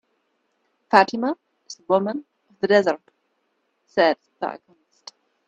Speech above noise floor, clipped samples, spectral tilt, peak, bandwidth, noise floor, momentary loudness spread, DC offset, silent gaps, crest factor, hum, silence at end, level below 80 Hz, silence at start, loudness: 51 dB; under 0.1%; -5 dB/octave; 0 dBFS; 8.6 kHz; -71 dBFS; 17 LU; under 0.1%; none; 24 dB; none; 0.9 s; -72 dBFS; 0.9 s; -21 LUFS